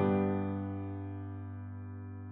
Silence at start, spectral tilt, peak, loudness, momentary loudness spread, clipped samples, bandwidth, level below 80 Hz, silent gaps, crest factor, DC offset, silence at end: 0 s; -9 dB/octave; -18 dBFS; -38 LUFS; 13 LU; under 0.1%; 3.8 kHz; -72 dBFS; none; 18 dB; under 0.1%; 0 s